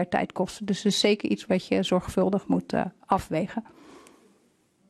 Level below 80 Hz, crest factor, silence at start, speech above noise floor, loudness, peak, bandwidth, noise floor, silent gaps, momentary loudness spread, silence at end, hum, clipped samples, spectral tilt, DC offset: -54 dBFS; 18 dB; 0 s; 39 dB; -26 LUFS; -8 dBFS; 13 kHz; -65 dBFS; none; 7 LU; 0.9 s; none; under 0.1%; -5 dB/octave; under 0.1%